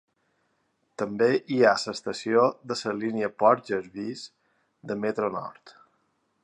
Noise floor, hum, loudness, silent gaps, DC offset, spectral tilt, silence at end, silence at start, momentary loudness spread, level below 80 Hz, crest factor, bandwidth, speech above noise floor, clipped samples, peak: -72 dBFS; none; -26 LUFS; none; under 0.1%; -5 dB/octave; 0.75 s; 1 s; 14 LU; -72 dBFS; 22 dB; 10.5 kHz; 47 dB; under 0.1%; -6 dBFS